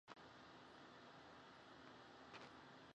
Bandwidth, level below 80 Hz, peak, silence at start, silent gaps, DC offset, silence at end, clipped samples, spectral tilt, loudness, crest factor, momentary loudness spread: 9 kHz; -86 dBFS; -40 dBFS; 0.05 s; none; under 0.1%; 0 s; under 0.1%; -4 dB/octave; -62 LUFS; 22 dB; 3 LU